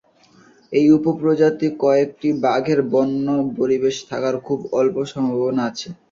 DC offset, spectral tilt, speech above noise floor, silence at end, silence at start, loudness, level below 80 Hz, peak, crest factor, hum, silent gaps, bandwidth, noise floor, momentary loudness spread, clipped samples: under 0.1%; -6.5 dB/octave; 33 dB; 0.2 s; 0.7 s; -19 LUFS; -60 dBFS; -2 dBFS; 16 dB; none; none; 7.6 kHz; -52 dBFS; 7 LU; under 0.1%